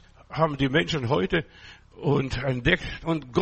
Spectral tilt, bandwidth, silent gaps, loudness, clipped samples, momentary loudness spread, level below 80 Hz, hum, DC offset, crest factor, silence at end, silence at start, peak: -6.5 dB/octave; 8.4 kHz; none; -25 LUFS; under 0.1%; 7 LU; -44 dBFS; none; under 0.1%; 20 dB; 0 s; 0.3 s; -6 dBFS